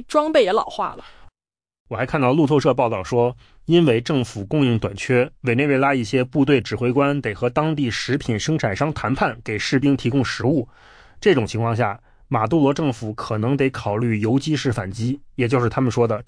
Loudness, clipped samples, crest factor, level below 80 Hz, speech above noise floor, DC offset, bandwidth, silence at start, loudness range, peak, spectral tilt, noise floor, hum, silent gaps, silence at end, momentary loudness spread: -20 LUFS; under 0.1%; 14 dB; -48 dBFS; over 70 dB; under 0.1%; 10.5 kHz; 0 s; 2 LU; -6 dBFS; -6.5 dB/octave; under -90 dBFS; none; 1.80-1.85 s; 0.05 s; 8 LU